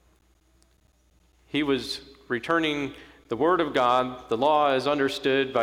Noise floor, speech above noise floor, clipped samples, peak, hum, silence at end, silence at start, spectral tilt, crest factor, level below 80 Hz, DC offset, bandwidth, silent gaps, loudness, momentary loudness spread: -63 dBFS; 39 dB; under 0.1%; -10 dBFS; none; 0 s; 1.55 s; -5 dB/octave; 16 dB; -58 dBFS; under 0.1%; 15.5 kHz; none; -25 LUFS; 11 LU